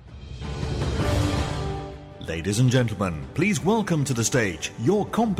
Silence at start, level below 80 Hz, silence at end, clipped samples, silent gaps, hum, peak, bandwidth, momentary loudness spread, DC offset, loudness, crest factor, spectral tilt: 0 s; -38 dBFS; 0 s; under 0.1%; none; none; -8 dBFS; 15.5 kHz; 13 LU; under 0.1%; -24 LUFS; 16 dB; -5.5 dB/octave